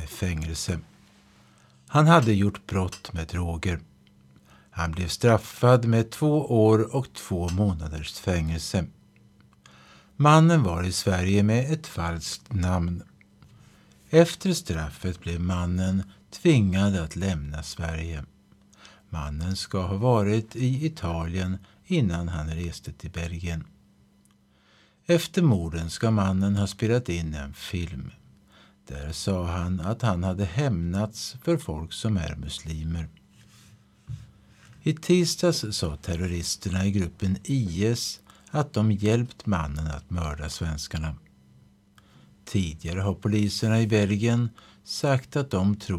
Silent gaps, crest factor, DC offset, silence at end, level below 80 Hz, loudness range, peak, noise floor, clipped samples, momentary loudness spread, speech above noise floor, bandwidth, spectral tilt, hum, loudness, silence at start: none; 22 dB; under 0.1%; 0 s; -42 dBFS; 8 LU; -4 dBFS; -61 dBFS; under 0.1%; 13 LU; 36 dB; 14.5 kHz; -6 dB/octave; none; -26 LUFS; 0 s